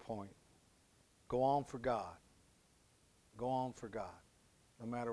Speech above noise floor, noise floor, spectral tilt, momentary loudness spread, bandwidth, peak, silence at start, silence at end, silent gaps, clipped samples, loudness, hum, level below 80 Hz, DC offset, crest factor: 31 dB; -71 dBFS; -6.5 dB/octave; 21 LU; 11 kHz; -24 dBFS; 0 s; 0 s; none; under 0.1%; -41 LUFS; none; -68 dBFS; under 0.1%; 20 dB